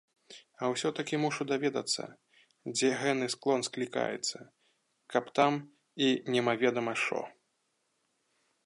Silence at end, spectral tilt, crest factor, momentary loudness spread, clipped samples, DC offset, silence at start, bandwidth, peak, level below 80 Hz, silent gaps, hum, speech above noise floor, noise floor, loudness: 1.35 s; -3.5 dB/octave; 22 dB; 9 LU; under 0.1%; under 0.1%; 0.3 s; 11.5 kHz; -12 dBFS; -84 dBFS; none; none; 47 dB; -78 dBFS; -31 LUFS